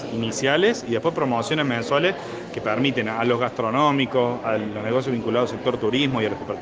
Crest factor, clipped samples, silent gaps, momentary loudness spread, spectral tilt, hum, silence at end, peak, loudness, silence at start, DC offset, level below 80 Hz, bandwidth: 18 dB; under 0.1%; none; 6 LU; -5 dB/octave; none; 0 s; -4 dBFS; -22 LUFS; 0 s; under 0.1%; -58 dBFS; 9.8 kHz